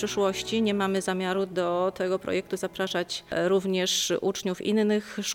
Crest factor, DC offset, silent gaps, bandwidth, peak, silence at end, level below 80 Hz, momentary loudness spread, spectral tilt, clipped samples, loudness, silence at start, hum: 14 dB; under 0.1%; none; 17.5 kHz; -14 dBFS; 0 s; -62 dBFS; 5 LU; -4 dB/octave; under 0.1%; -27 LUFS; 0 s; none